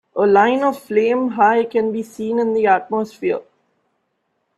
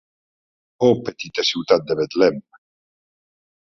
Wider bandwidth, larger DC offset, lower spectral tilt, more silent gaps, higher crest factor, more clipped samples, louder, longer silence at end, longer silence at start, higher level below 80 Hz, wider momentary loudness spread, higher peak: first, 13 kHz vs 7.4 kHz; neither; about the same, -6 dB/octave vs -5 dB/octave; neither; about the same, 18 dB vs 20 dB; neither; first, -17 LUFS vs -20 LUFS; second, 1.15 s vs 1.4 s; second, 0.15 s vs 0.8 s; about the same, -64 dBFS vs -62 dBFS; first, 9 LU vs 6 LU; about the same, 0 dBFS vs -2 dBFS